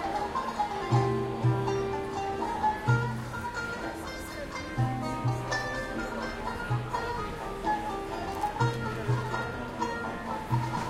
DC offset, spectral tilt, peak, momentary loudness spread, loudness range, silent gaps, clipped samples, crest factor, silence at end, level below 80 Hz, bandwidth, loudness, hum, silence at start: under 0.1%; -6 dB/octave; -14 dBFS; 8 LU; 4 LU; none; under 0.1%; 18 dB; 0 s; -48 dBFS; 14 kHz; -31 LUFS; none; 0 s